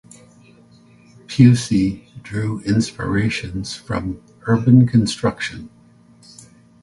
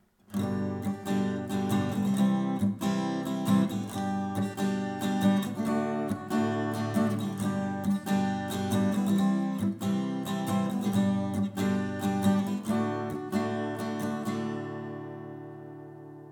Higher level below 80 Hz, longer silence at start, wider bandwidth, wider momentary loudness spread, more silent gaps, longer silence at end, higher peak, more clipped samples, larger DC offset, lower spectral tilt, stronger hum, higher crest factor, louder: first, -44 dBFS vs -68 dBFS; first, 1.3 s vs 0.3 s; second, 11.5 kHz vs 18.5 kHz; first, 16 LU vs 8 LU; neither; first, 1.15 s vs 0 s; first, 0 dBFS vs -12 dBFS; neither; neither; about the same, -6.5 dB/octave vs -6.5 dB/octave; neither; about the same, 20 dB vs 16 dB; first, -18 LUFS vs -30 LUFS